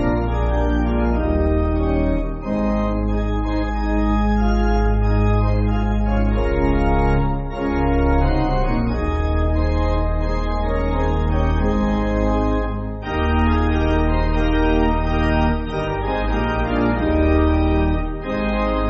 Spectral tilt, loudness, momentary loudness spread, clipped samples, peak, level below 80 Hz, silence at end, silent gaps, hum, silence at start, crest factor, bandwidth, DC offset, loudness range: -7 dB/octave; -20 LUFS; 4 LU; under 0.1%; -6 dBFS; -22 dBFS; 0 s; none; none; 0 s; 12 dB; 7 kHz; under 0.1%; 1 LU